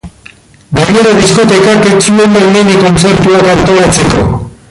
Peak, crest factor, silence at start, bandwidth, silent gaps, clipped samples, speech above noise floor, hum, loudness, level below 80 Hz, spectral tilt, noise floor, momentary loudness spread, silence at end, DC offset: 0 dBFS; 6 dB; 0.05 s; 11.5 kHz; none; under 0.1%; 31 dB; none; -6 LUFS; -28 dBFS; -5 dB/octave; -36 dBFS; 5 LU; 0.15 s; under 0.1%